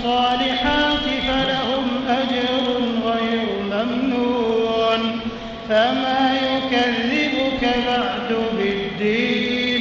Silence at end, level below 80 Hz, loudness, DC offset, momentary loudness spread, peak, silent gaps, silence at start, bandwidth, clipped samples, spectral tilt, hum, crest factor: 0 s; -42 dBFS; -20 LUFS; under 0.1%; 4 LU; -6 dBFS; none; 0 s; 7.4 kHz; under 0.1%; -2 dB/octave; none; 14 dB